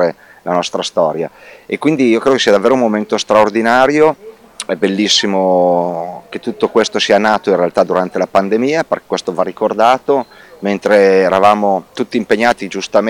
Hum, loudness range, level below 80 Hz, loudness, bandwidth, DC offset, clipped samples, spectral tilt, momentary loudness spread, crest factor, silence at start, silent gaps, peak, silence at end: none; 2 LU; -54 dBFS; -13 LUFS; 16.5 kHz; under 0.1%; under 0.1%; -4.5 dB/octave; 11 LU; 14 dB; 0 s; none; 0 dBFS; 0 s